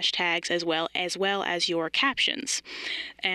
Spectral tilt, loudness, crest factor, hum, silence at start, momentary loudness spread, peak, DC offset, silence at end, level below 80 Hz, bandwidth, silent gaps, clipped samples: -1.5 dB/octave; -26 LUFS; 18 dB; none; 0 s; 6 LU; -10 dBFS; under 0.1%; 0 s; -68 dBFS; 13 kHz; none; under 0.1%